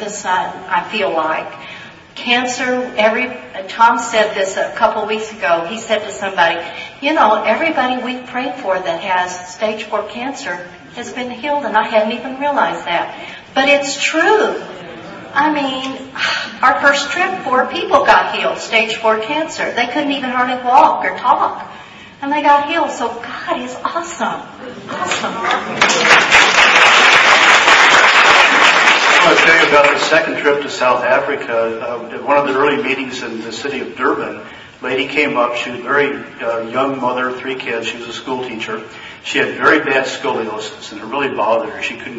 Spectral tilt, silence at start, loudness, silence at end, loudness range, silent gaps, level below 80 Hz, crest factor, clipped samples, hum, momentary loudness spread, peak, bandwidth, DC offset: -2 dB/octave; 0 s; -14 LUFS; 0 s; 11 LU; none; -54 dBFS; 16 dB; under 0.1%; none; 17 LU; 0 dBFS; 11 kHz; under 0.1%